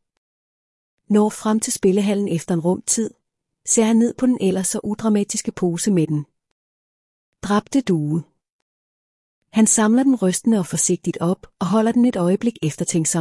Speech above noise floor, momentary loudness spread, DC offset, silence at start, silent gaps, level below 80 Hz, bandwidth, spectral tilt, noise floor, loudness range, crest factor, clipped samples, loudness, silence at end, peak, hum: 41 dB; 8 LU; under 0.1%; 1.1 s; 6.52-7.32 s, 8.52-9.42 s; -58 dBFS; 12 kHz; -5 dB/octave; -59 dBFS; 5 LU; 14 dB; under 0.1%; -19 LUFS; 0 s; -6 dBFS; none